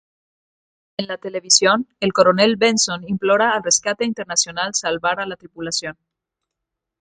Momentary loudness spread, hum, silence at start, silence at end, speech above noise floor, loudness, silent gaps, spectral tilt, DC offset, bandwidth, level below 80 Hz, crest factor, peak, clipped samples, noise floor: 14 LU; none; 1 s; 1.1 s; 63 dB; -18 LUFS; none; -2 dB/octave; under 0.1%; 10 kHz; -62 dBFS; 20 dB; 0 dBFS; under 0.1%; -82 dBFS